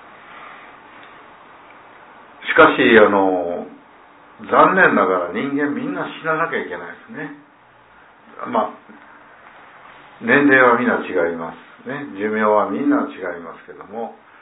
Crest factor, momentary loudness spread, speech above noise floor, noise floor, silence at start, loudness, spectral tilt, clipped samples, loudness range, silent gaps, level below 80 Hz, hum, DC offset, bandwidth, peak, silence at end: 20 dB; 22 LU; 32 dB; -49 dBFS; 0.3 s; -16 LUFS; -9 dB/octave; under 0.1%; 11 LU; none; -60 dBFS; none; under 0.1%; 4 kHz; 0 dBFS; 0.3 s